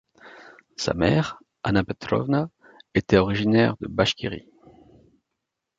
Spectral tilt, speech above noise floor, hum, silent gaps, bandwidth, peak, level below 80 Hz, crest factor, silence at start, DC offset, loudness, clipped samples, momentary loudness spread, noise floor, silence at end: -6 dB/octave; 60 dB; none; none; 7.8 kHz; -4 dBFS; -46 dBFS; 22 dB; 0.25 s; under 0.1%; -23 LUFS; under 0.1%; 12 LU; -82 dBFS; 1.4 s